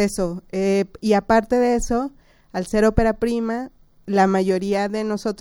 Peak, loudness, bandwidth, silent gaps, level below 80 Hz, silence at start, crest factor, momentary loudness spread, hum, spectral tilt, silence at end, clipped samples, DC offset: 0 dBFS; -21 LUFS; 17 kHz; none; -36 dBFS; 0 s; 20 dB; 10 LU; none; -6 dB/octave; 0.05 s; under 0.1%; under 0.1%